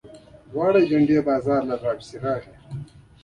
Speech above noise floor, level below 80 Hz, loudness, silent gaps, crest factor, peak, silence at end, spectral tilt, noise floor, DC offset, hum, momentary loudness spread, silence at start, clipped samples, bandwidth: 25 dB; -54 dBFS; -22 LUFS; none; 16 dB; -8 dBFS; 0.4 s; -8 dB/octave; -46 dBFS; under 0.1%; none; 19 LU; 0.05 s; under 0.1%; 10 kHz